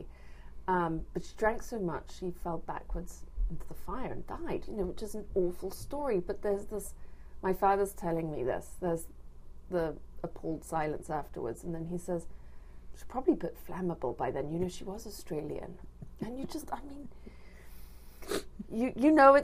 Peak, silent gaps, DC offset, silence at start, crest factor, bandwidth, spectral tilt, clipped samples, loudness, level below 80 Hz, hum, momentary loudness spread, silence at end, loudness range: -8 dBFS; none; under 0.1%; 0 s; 26 dB; 15.5 kHz; -6.5 dB/octave; under 0.1%; -35 LUFS; -46 dBFS; none; 19 LU; 0 s; 6 LU